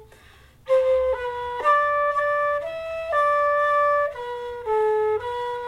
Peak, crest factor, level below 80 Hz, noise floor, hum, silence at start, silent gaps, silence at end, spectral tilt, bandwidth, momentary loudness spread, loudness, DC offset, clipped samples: -8 dBFS; 14 dB; -52 dBFS; -51 dBFS; none; 0 s; none; 0 s; -3.5 dB/octave; 12 kHz; 9 LU; -22 LUFS; under 0.1%; under 0.1%